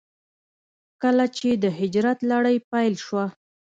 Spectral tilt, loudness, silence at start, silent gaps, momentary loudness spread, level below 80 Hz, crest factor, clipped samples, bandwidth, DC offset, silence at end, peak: -6 dB/octave; -23 LUFS; 1 s; 2.64-2.71 s; 6 LU; -68 dBFS; 14 dB; under 0.1%; 7.8 kHz; under 0.1%; 0.5 s; -10 dBFS